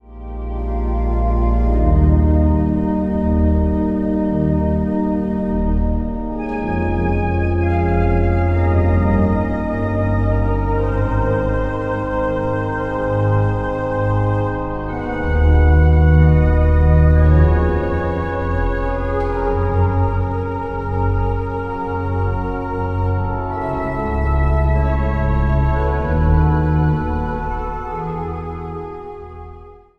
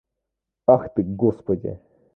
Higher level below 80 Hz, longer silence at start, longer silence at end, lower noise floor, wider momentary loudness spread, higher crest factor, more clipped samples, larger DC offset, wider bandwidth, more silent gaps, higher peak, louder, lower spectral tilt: first, -20 dBFS vs -50 dBFS; second, 0.05 s vs 0.7 s; second, 0.2 s vs 0.4 s; second, -39 dBFS vs -83 dBFS; second, 10 LU vs 13 LU; second, 14 dB vs 22 dB; neither; neither; first, 4.4 kHz vs 2.5 kHz; neither; about the same, -2 dBFS vs -2 dBFS; first, -18 LUFS vs -22 LUFS; second, -10.5 dB/octave vs -12.5 dB/octave